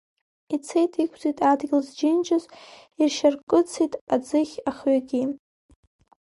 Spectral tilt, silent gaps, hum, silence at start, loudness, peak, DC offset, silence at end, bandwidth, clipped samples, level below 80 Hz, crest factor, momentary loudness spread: -4 dB/octave; 3.43-3.47 s, 4.01-4.07 s; none; 0.5 s; -24 LUFS; -8 dBFS; under 0.1%; 0.9 s; 11.5 kHz; under 0.1%; -66 dBFS; 18 dB; 7 LU